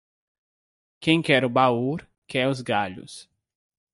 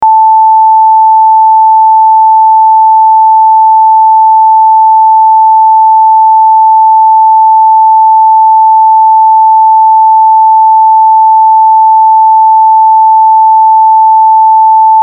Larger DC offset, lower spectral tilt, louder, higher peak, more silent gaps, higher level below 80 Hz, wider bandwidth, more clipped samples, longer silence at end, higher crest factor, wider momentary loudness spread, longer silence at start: neither; first, -5.5 dB/octave vs -3 dB/octave; second, -23 LUFS vs -3 LUFS; second, -6 dBFS vs 0 dBFS; first, 2.18-2.22 s vs none; about the same, -64 dBFS vs -68 dBFS; first, 11.5 kHz vs 1.2 kHz; neither; first, 0.7 s vs 0 s; first, 20 dB vs 4 dB; first, 18 LU vs 0 LU; first, 1 s vs 0 s